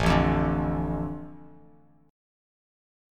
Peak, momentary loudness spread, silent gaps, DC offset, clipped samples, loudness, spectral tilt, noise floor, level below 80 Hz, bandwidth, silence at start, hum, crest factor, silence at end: -8 dBFS; 17 LU; none; under 0.1%; under 0.1%; -27 LUFS; -7 dB/octave; -57 dBFS; -38 dBFS; 11.5 kHz; 0 s; none; 22 dB; 1.65 s